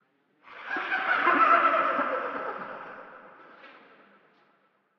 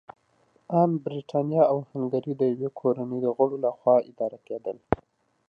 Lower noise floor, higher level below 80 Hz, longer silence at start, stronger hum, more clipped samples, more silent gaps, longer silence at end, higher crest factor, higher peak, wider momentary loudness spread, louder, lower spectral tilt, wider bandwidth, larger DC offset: about the same, -68 dBFS vs -65 dBFS; second, -76 dBFS vs -56 dBFS; second, 0.5 s vs 0.7 s; neither; neither; neither; first, 1.3 s vs 0.55 s; about the same, 20 dB vs 24 dB; second, -8 dBFS vs -2 dBFS; first, 23 LU vs 10 LU; about the same, -25 LUFS vs -26 LUFS; second, -5 dB/octave vs -10.5 dB/octave; first, 6.2 kHz vs 5.4 kHz; neither